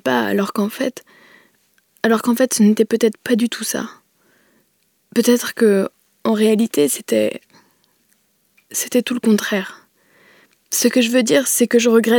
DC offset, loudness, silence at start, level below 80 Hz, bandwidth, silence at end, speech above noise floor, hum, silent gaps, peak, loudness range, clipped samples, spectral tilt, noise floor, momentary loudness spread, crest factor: under 0.1%; -17 LUFS; 0.05 s; -74 dBFS; 19.5 kHz; 0 s; 47 dB; none; none; -2 dBFS; 3 LU; under 0.1%; -4 dB/octave; -63 dBFS; 10 LU; 18 dB